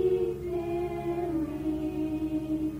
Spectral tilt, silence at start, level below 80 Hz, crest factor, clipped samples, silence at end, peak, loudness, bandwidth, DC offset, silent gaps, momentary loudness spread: -8.5 dB/octave; 0 s; -48 dBFS; 12 dB; under 0.1%; 0 s; -18 dBFS; -31 LUFS; 16 kHz; under 0.1%; none; 2 LU